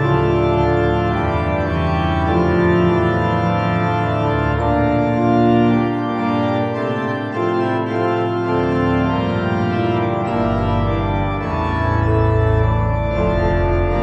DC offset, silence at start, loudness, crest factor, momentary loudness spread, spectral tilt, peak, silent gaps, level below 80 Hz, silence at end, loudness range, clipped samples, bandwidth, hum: under 0.1%; 0 s; -18 LUFS; 12 dB; 4 LU; -9 dB/octave; -4 dBFS; none; -28 dBFS; 0 s; 2 LU; under 0.1%; 7.4 kHz; none